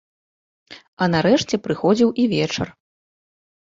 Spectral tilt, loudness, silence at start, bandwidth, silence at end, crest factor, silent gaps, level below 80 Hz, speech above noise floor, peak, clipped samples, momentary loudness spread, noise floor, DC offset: -5.5 dB/octave; -19 LUFS; 0.7 s; 7.8 kHz; 1.05 s; 18 dB; 0.88-0.97 s; -54 dBFS; over 71 dB; -4 dBFS; under 0.1%; 7 LU; under -90 dBFS; under 0.1%